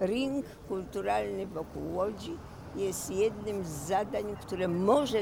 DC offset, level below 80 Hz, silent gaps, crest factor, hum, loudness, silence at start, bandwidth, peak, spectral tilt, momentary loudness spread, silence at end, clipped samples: under 0.1%; -54 dBFS; none; 18 dB; none; -33 LUFS; 0 s; 18.5 kHz; -14 dBFS; -5 dB/octave; 11 LU; 0 s; under 0.1%